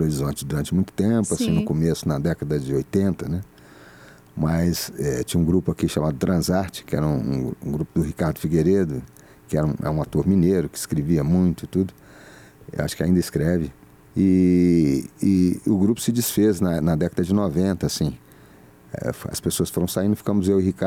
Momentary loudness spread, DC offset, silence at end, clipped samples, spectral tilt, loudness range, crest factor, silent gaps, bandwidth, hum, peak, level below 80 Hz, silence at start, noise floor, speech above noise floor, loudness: 9 LU; under 0.1%; 0 s; under 0.1%; -6.5 dB/octave; 4 LU; 12 dB; none; 17 kHz; none; -8 dBFS; -44 dBFS; 0 s; -49 dBFS; 28 dB; -22 LUFS